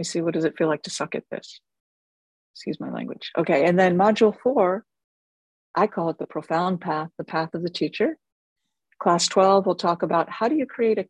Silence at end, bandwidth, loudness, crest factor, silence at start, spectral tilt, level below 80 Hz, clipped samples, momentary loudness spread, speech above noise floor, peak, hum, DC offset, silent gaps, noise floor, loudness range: 0.05 s; 11.5 kHz; -23 LUFS; 18 dB; 0 s; -5 dB/octave; -68 dBFS; under 0.1%; 14 LU; over 67 dB; -6 dBFS; none; under 0.1%; 1.80-2.54 s, 5.04-5.74 s, 8.32-8.56 s; under -90 dBFS; 5 LU